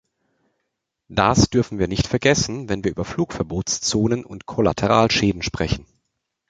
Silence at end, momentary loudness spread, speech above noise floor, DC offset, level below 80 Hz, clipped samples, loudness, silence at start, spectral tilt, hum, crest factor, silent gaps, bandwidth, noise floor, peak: 0.7 s; 9 LU; 57 dB; under 0.1%; -38 dBFS; under 0.1%; -21 LUFS; 1.1 s; -4.5 dB/octave; none; 20 dB; none; 9.4 kHz; -78 dBFS; -2 dBFS